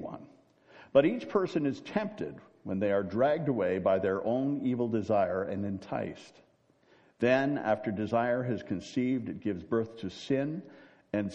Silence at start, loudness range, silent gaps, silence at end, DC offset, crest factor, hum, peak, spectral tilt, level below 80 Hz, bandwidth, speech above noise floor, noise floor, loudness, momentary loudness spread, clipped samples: 0 s; 3 LU; none; 0 s; under 0.1%; 20 dB; none; -10 dBFS; -7.5 dB/octave; -68 dBFS; 8.4 kHz; 35 dB; -65 dBFS; -31 LUFS; 11 LU; under 0.1%